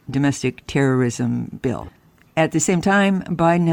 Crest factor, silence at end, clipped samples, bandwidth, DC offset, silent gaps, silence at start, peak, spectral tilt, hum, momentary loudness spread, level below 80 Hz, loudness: 14 dB; 0 s; under 0.1%; 18 kHz; under 0.1%; none; 0.1 s; -6 dBFS; -5.5 dB/octave; none; 9 LU; -48 dBFS; -20 LUFS